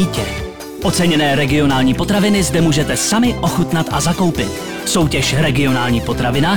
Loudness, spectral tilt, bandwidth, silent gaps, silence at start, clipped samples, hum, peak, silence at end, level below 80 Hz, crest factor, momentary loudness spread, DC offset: -15 LUFS; -4.5 dB/octave; over 20 kHz; none; 0 s; under 0.1%; none; -6 dBFS; 0 s; -32 dBFS; 10 dB; 8 LU; 1%